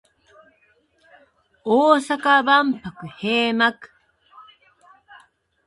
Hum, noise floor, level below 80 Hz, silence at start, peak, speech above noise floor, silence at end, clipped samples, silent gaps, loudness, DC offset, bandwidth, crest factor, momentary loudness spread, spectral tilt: none; -62 dBFS; -66 dBFS; 1.65 s; 0 dBFS; 43 dB; 1.25 s; under 0.1%; none; -18 LUFS; under 0.1%; 11.5 kHz; 22 dB; 15 LU; -4.5 dB/octave